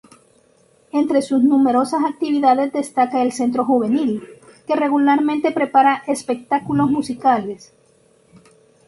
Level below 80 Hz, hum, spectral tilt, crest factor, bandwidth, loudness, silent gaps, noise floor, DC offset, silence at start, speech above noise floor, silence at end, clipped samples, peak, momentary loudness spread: -62 dBFS; none; -5.5 dB/octave; 16 dB; 11.5 kHz; -18 LUFS; none; -56 dBFS; under 0.1%; 0.95 s; 38 dB; 1.3 s; under 0.1%; -2 dBFS; 8 LU